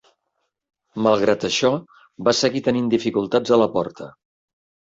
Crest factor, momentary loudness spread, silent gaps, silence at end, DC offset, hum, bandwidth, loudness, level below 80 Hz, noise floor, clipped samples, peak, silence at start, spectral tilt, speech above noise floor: 18 dB; 12 LU; none; 0.85 s; under 0.1%; none; 8 kHz; -20 LUFS; -60 dBFS; -75 dBFS; under 0.1%; -4 dBFS; 0.95 s; -4.5 dB/octave; 56 dB